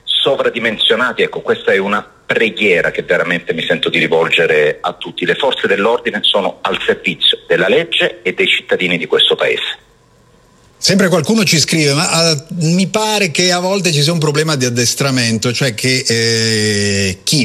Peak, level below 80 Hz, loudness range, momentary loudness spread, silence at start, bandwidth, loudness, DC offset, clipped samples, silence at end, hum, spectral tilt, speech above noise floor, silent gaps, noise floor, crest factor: 0 dBFS; -54 dBFS; 2 LU; 5 LU; 0.05 s; 14 kHz; -13 LUFS; under 0.1%; under 0.1%; 0 s; none; -3.5 dB/octave; 35 dB; none; -48 dBFS; 14 dB